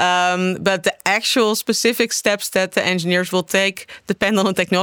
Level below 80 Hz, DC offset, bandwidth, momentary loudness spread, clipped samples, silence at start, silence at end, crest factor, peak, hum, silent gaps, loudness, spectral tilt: -60 dBFS; under 0.1%; over 20 kHz; 3 LU; under 0.1%; 0 s; 0 s; 16 dB; -2 dBFS; none; none; -18 LUFS; -3.5 dB/octave